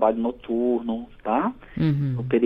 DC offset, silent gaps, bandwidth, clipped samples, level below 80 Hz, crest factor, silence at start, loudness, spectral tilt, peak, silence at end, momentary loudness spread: under 0.1%; none; 5.2 kHz; under 0.1%; -50 dBFS; 16 dB; 0 s; -25 LUFS; -10.5 dB/octave; -6 dBFS; 0 s; 6 LU